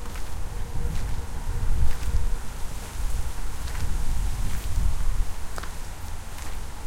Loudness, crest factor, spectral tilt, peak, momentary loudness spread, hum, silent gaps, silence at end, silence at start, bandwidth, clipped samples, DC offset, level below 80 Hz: -33 LUFS; 16 dB; -4.5 dB/octave; -8 dBFS; 9 LU; none; none; 0 s; 0 s; 15.5 kHz; under 0.1%; under 0.1%; -26 dBFS